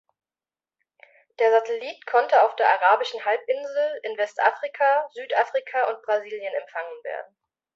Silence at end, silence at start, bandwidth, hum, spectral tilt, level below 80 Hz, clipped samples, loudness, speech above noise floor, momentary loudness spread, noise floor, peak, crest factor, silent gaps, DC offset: 0.5 s; 1.4 s; 7.6 kHz; none; -1 dB/octave; -84 dBFS; under 0.1%; -23 LUFS; over 67 dB; 12 LU; under -90 dBFS; -4 dBFS; 20 dB; none; under 0.1%